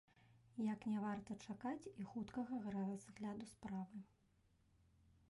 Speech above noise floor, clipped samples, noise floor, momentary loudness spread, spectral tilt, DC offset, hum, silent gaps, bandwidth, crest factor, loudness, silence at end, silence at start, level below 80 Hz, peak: 30 dB; under 0.1%; -77 dBFS; 9 LU; -7 dB/octave; under 0.1%; none; none; 11.5 kHz; 14 dB; -48 LUFS; 1.25 s; 0.2 s; -78 dBFS; -34 dBFS